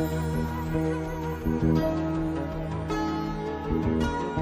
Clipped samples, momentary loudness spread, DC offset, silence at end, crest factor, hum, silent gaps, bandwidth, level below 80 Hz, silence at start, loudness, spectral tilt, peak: under 0.1%; 7 LU; under 0.1%; 0 s; 16 dB; none; none; 15.5 kHz; -38 dBFS; 0 s; -28 LUFS; -7.5 dB/octave; -12 dBFS